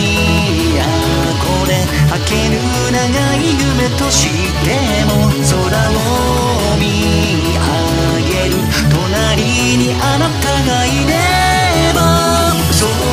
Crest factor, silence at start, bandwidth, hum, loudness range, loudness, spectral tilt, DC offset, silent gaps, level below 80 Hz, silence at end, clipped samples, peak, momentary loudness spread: 12 dB; 0 s; 15.5 kHz; none; 1 LU; -13 LUFS; -4.5 dB/octave; under 0.1%; none; -22 dBFS; 0 s; under 0.1%; 0 dBFS; 3 LU